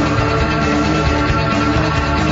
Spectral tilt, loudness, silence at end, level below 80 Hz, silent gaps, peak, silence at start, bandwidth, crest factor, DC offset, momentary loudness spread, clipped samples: -6 dB/octave; -15 LUFS; 0 s; -26 dBFS; none; -2 dBFS; 0 s; 7.8 kHz; 12 dB; under 0.1%; 1 LU; under 0.1%